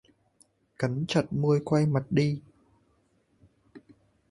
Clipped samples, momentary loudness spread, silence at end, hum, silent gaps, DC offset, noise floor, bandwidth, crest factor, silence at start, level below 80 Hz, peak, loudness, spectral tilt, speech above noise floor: under 0.1%; 7 LU; 0.55 s; none; none; under 0.1%; -68 dBFS; 11.5 kHz; 20 dB; 0.8 s; -62 dBFS; -10 dBFS; -27 LUFS; -7 dB/octave; 43 dB